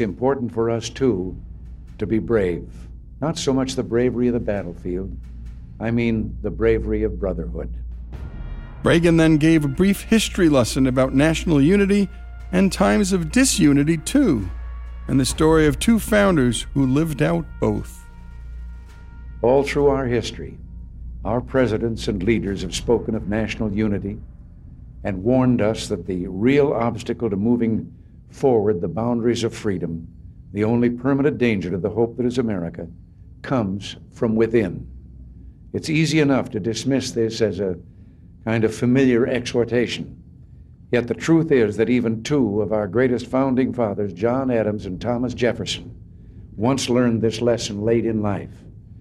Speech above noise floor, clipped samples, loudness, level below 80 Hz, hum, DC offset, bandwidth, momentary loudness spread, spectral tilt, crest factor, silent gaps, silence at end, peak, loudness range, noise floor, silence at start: 25 dB; under 0.1%; -20 LUFS; -36 dBFS; none; under 0.1%; 16 kHz; 18 LU; -6 dB/octave; 16 dB; none; 0 s; -4 dBFS; 6 LU; -44 dBFS; 0 s